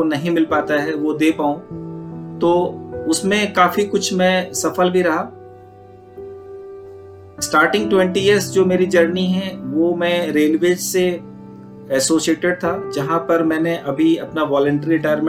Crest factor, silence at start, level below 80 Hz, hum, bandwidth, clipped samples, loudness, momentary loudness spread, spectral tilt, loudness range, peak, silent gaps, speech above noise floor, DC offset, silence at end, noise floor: 16 dB; 0 s; -54 dBFS; none; 16.5 kHz; under 0.1%; -17 LUFS; 16 LU; -4.5 dB/octave; 4 LU; -2 dBFS; none; 25 dB; under 0.1%; 0 s; -42 dBFS